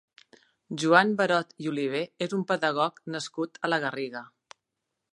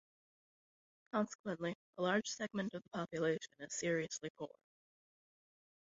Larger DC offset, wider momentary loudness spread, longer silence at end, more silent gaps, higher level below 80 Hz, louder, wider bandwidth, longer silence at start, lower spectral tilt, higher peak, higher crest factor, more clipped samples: neither; first, 14 LU vs 8 LU; second, 0.9 s vs 1.4 s; second, none vs 1.35-1.44 s, 1.75-1.93 s, 4.30-4.35 s; about the same, -82 dBFS vs -80 dBFS; first, -27 LUFS vs -41 LUFS; first, 11.5 kHz vs 7.6 kHz; second, 0.7 s vs 1.15 s; about the same, -5 dB/octave vs -4 dB/octave; first, -4 dBFS vs -22 dBFS; about the same, 24 dB vs 22 dB; neither